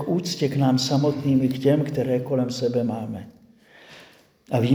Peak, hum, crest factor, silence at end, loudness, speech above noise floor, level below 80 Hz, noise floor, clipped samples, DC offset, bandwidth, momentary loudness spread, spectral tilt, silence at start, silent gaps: -6 dBFS; none; 18 dB; 0 s; -23 LUFS; 30 dB; -62 dBFS; -52 dBFS; under 0.1%; under 0.1%; over 20 kHz; 7 LU; -6.5 dB/octave; 0 s; none